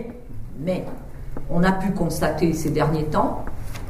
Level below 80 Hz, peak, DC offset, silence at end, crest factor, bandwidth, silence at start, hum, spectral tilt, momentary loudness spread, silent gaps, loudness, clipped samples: -34 dBFS; -6 dBFS; under 0.1%; 0 s; 16 dB; 15.5 kHz; 0 s; none; -6.5 dB/octave; 16 LU; none; -23 LUFS; under 0.1%